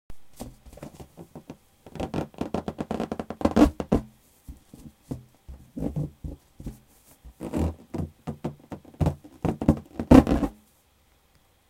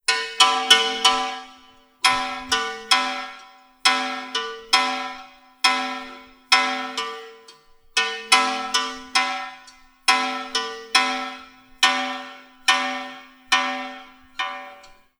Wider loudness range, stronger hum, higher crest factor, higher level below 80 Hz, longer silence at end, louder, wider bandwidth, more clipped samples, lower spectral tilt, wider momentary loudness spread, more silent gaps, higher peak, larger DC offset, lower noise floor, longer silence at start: first, 11 LU vs 3 LU; neither; about the same, 26 dB vs 24 dB; first, -38 dBFS vs -60 dBFS; first, 1.2 s vs 0.35 s; second, -26 LUFS vs -21 LUFS; second, 16 kHz vs over 20 kHz; neither; first, -8 dB/octave vs 1 dB/octave; first, 24 LU vs 18 LU; neither; about the same, 0 dBFS vs 0 dBFS; neither; first, -63 dBFS vs -51 dBFS; about the same, 0.1 s vs 0.1 s